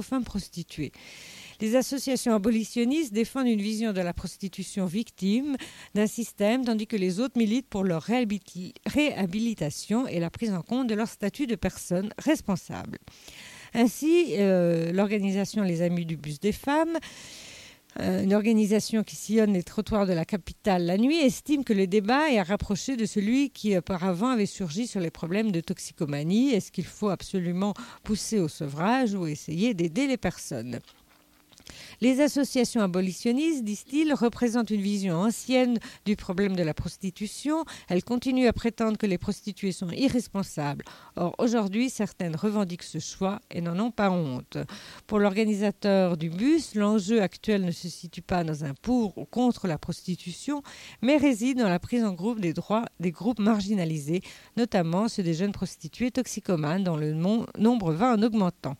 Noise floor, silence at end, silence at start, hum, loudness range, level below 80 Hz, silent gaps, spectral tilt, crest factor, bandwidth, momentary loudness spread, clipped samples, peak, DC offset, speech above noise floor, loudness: -60 dBFS; 0.05 s; 0 s; none; 4 LU; -54 dBFS; none; -6 dB/octave; 16 dB; 16 kHz; 11 LU; under 0.1%; -10 dBFS; under 0.1%; 34 dB; -27 LUFS